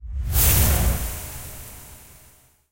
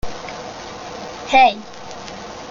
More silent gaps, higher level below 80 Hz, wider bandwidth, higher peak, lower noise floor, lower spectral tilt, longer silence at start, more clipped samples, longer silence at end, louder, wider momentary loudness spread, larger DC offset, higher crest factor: neither; first, -28 dBFS vs -44 dBFS; first, 16.5 kHz vs 7.4 kHz; second, -4 dBFS vs 0 dBFS; first, -54 dBFS vs -33 dBFS; about the same, -3.5 dB/octave vs -3 dB/octave; about the same, 0 s vs 0.05 s; neither; first, 0.75 s vs 0 s; second, -20 LUFS vs -14 LUFS; first, 24 LU vs 19 LU; neither; about the same, 20 dB vs 20 dB